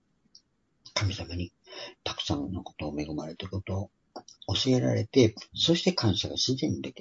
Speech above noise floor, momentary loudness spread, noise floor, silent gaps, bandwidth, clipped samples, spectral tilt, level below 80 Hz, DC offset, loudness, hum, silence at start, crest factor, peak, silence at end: 37 dB; 16 LU; -65 dBFS; none; 7.8 kHz; under 0.1%; -5 dB/octave; -54 dBFS; under 0.1%; -29 LUFS; none; 0.85 s; 22 dB; -8 dBFS; 0 s